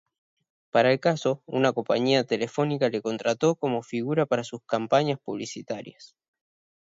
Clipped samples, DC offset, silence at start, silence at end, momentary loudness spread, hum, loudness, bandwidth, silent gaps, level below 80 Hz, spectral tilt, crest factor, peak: under 0.1%; under 0.1%; 0.75 s; 0.85 s; 11 LU; none; -26 LUFS; 7.8 kHz; none; -72 dBFS; -5.5 dB/octave; 20 dB; -6 dBFS